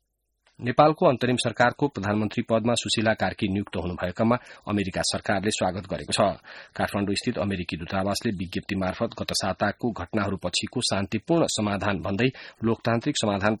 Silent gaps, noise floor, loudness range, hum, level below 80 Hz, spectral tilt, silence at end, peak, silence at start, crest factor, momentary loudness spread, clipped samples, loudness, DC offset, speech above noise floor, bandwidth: none; -69 dBFS; 4 LU; none; -54 dBFS; -4.5 dB/octave; 0 s; -6 dBFS; 0.6 s; 20 dB; 7 LU; under 0.1%; -26 LUFS; under 0.1%; 44 dB; 13.5 kHz